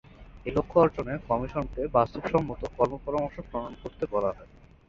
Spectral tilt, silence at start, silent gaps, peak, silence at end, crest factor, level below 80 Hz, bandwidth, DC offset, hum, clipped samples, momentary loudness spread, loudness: -8.5 dB/octave; 0.2 s; none; -8 dBFS; 0.45 s; 22 dB; -46 dBFS; 7.4 kHz; under 0.1%; none; under 0.1%; 12 LU; -28 LUFS